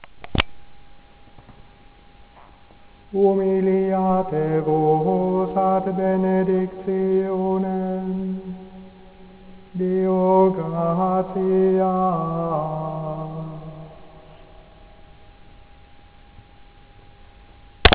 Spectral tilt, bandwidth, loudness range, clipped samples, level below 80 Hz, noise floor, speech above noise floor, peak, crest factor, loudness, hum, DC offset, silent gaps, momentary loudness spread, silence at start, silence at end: -11 dB/octave; 4 kHz; 11 LU; under 0.1%; -38 dBFS; -48 dBFS; 28 dB; 0 dBFS; 22 dB; -21 LUFS; none; under 0.1%; none; 14 LU; 0 s; 0 s